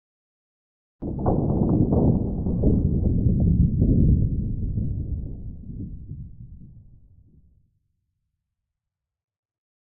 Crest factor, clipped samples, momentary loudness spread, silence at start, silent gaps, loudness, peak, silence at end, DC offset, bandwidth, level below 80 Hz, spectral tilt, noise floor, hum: 16 dB; under 0.1%; 17 LU; 1 s; none; -23 LUFS; -8 dBFS; 3.05 s; under 0.1%; 1.5 kHz; -30 dBFS; -17.5 dB/octave; -86 dBFS; none